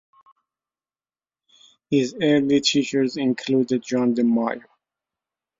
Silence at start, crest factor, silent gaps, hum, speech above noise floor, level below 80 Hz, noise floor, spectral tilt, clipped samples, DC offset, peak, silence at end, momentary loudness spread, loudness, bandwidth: 1.9 s; 18 dB; none; none; over 70 dB; -66 dBFS; under -90 dBFS; -5 dB/octave; under 0.1%; under 0.1%; -6 dBFS; 1 s; 6 LU; -21 LUFS; 7.8 kHz